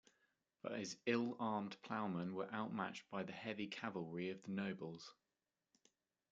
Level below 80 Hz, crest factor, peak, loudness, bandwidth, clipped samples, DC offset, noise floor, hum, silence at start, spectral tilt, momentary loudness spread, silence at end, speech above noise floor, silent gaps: -88 dBFS; 22 dB; -24 dBFS; -45 LUFS; 8.8 kHz; under 0.1%; under 0.1%; under -90 dBFS; none; 0.65 s; -5.5 dB/octave; 9 LU; 1.2 s; over 45 dB; none